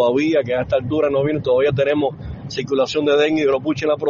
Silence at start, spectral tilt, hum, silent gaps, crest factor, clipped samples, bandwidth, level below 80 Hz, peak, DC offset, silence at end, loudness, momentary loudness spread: 0 s; -5 dB/octave; none; none; 12 dB; under 0.1%; 7.4 kHz; -46 dBFS; -6 dBFS; under 0.1%; 0 s; -18 LUFS; 7 LU